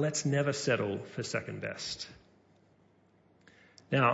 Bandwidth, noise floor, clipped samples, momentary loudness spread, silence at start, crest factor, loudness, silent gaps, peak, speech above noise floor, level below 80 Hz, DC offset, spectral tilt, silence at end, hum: 8 kHz; -66 dBFS; under 0.1%; 9 LU; 0 s; 20 dB; -33 LUFS; none; -14 dBFS; 33 dB; -70 dBFS; under 0.1%; -4.5 dB/octave; 0 s; none